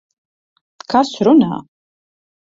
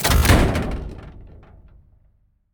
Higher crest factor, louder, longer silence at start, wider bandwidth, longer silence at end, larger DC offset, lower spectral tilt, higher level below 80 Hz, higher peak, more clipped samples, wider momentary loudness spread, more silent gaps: about the same, 16 dB vs 16 dB; first, -14 LUFS vs -19 LUFS; first, 0.9 s vs 0 s; second, 7.8 kHz vs over 20 kHz; second, 0.8 s vs 1.25 s; neither; first, -6.5 dB/octave vs -4.5 dB/octave; second, -60 dBFS vs -26 dBFS; about the same, -2 dBFS vs -4 dBFS; neither; second, 10 LU vs 25 LU; neither